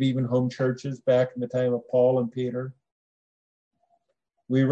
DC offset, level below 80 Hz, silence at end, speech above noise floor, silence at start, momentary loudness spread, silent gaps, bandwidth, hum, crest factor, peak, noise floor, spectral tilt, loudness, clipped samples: under 0.1%; -72 dBFS; 0 s; 53 dB; 0 s; 8 LU; 2.92-3.71 s; 7.8 kHz; none; 16 dB; -10 dBFS; -78 dBFS; -8 dB/octave; -25 LUFS; under 0.1%